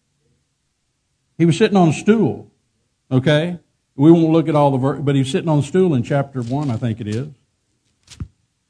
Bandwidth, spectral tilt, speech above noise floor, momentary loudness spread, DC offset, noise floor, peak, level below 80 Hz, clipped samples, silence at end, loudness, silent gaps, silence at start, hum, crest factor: 10 kHz; -7.5 dB/octave; 54 dB; 21 LU; under 0.1%; -69 dBFS; 0 dBFS; -52 dBFS; under 0.1%; 0.45 s; -17 LUFS; none; 1.4 s; none; 18 dB